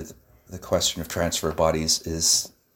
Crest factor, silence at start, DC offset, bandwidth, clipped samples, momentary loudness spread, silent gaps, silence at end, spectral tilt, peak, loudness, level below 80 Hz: 18 dB; 0 s; under 0.1%; 17.5 kHz; under 0.1%; 18 LU; none; 0.25 s; -2.5 dB/octave; -8 dBFS; -23 LUFS; -44 dBFS